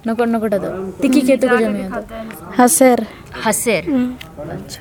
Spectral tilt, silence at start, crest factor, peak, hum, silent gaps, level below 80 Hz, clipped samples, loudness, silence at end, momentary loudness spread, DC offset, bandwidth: -4 dB/octave; 0.05 s; 16 dB; 0 dBFS; none; none; -46 dBFS; under 0.1%; -16 LUFS; 0 s; 17 LU; under 0.1%; 19 kHz